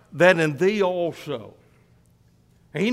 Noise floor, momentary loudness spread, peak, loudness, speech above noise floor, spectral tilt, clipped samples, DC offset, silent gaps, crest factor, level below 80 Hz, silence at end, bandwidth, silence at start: -58 dBFS; 17 LU; -4 dBFS; -21 LUFS; 37 dB; -6 dB/octave; under 0.1%; under 0.1%; none; 20 dB; -64 dBFS; 0 s; 14.5 kHz; 0.15 s